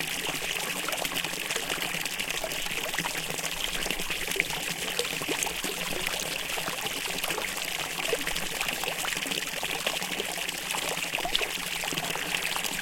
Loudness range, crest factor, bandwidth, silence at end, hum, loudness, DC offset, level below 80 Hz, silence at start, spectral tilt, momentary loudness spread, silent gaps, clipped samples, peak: 1 LU; 26 dB; 17 kHz; 0 s; none; -29 LUFS; under 0.1%; -50 dBFS; 0 s; -1 dB/octave; 2 LU; none; under 0.1%; -6 dBFS